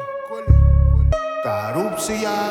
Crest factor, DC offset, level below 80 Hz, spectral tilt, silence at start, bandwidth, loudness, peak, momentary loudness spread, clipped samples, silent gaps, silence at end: 16 dB; under 0.1%; -20 dBFS; -6.5 dB/octave; 0 s; 14.5 kHz; -19 LUFS; 0 dBFS; 9 LU; under 0.1%; none; 0 s